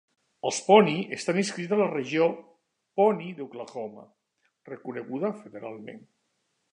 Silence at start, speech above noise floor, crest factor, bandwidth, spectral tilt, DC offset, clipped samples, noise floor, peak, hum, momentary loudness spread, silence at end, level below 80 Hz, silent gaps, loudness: 0.45 s; 50 dB; 24 dB; 10.5 kHz; -5 dB/octave; under 0.1%; under 0.1%; -76 dBFS; -4 dBFS; none; 21 LU; 0.75 s; -80 dBFS; none; -26 LUFS